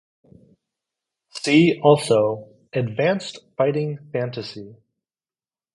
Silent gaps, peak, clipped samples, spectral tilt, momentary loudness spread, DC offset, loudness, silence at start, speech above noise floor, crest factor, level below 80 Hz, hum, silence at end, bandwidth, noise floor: none; -2 dBFS; under 0.1%; -6 dB/octave; 17 LU; under 0.1%; -20 LUFS; 1.35 s; over 70 dB; 20 dB; -64 dBFS; none; 1 s; 11.5 kHz; under -90 dBFS